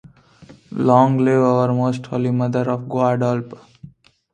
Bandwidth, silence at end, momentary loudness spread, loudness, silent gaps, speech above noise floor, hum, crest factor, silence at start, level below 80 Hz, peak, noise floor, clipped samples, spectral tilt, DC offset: 9.2 kHz; 0.45 s; 8 LU; -18 LUFS; none; 29 dB; none; 18 dB; 0.4 s; -60 dBFS; 0 dBFS; -46 dBFS; under 0.1%; -8.5 dB/octave; under 0.1%